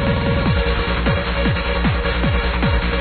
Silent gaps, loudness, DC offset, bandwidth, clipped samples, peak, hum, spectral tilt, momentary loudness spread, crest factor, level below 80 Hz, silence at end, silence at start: none; -19 LUFS; under 0.1%; 4.5 kHz; under 0.1%; -6 dBFS; none; -9.5 dB/octave; 1 LU; 12 dB; -22 dBFS; 0 s; 0 s